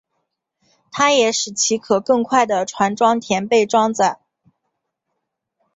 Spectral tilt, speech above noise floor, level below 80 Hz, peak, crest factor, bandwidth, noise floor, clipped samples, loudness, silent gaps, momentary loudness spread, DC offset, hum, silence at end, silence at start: -3 dB/octave; 60 dB; -62 dBFS; -2 dBFS; 18 dB; 8 kHz; -77 dBFS; under 0.1%; -17 LUFS; none; 5 LU; under 0.1%; none; 1.6 s; 0.95 s